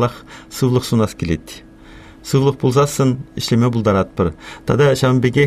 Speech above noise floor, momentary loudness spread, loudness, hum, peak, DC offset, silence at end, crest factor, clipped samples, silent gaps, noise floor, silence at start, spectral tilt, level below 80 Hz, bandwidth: 24 dB; 15 LU; -17 LUFS; none; -2 dBFS; under 0.1%; 0 s; 14 dB; under 0.1%; none; -40 dBFS; 0 s; -6.5 dB/octave; -42 dBFS; 15 kHz